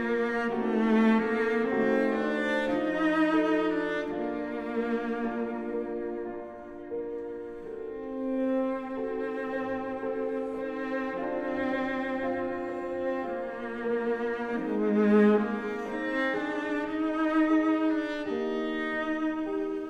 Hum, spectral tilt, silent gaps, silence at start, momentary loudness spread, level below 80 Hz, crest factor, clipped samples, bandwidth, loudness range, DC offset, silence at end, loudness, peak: none; -7 dB/octave; none; 0 s; 11 LU; -60 dBFS; 16 dB; under 0.1%; 8.4 kHz; 7 LU; under 0.1%; 0 s; -29 LUFS; -12 dBFS